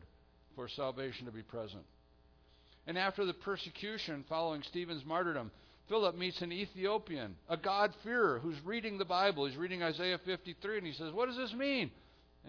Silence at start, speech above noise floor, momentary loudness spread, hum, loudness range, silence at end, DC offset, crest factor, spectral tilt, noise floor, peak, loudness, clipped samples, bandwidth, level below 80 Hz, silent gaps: 0 s; 28 dB; 13 LU; none; 6 LU; 0 s; under 0.1%; 20 dB; -2.5 dB/octave; -66 dBFS; -20 dBFS; -38 LUFS; under 0.1%; 5.4 kHz; -68 dBFS; none